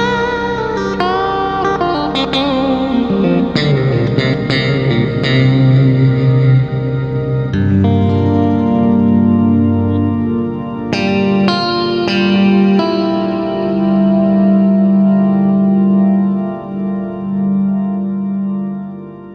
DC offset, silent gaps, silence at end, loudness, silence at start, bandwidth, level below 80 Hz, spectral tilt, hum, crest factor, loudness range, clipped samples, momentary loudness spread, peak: under 0.1%; none; 0 s; -13 LUFS; 0 s; 7.2 kHz; -40 dBFS; -8 dB/octave; 50 Hz at -40 dBFS; 12 dB; 3 LU; under 0.1%; 7 LU; 0 dBFS